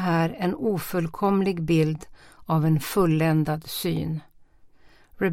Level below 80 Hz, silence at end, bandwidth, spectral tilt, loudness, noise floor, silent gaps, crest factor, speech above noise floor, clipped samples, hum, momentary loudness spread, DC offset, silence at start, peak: -50 dBFS; 0 s; 16.5 kHz; -7 dB/octave; -24 LUFS; -52 dBFS; none; 16 dB; 29 dB; under 0.1%; none; 7 LU; under 0.1%; 0 s; -10 dBFS